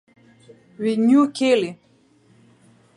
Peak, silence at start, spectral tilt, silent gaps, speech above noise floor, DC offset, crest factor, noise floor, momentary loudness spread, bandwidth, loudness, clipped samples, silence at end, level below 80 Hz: -6 dBFS; 0.8 s; -5.5 dB/octave; none; 39 dB; under 0.1%; 16 dB; -56 dBFS; 10 LU; 11 kHz; -19 LUFS; under 0.1%; 1.2 s; -74 dBFS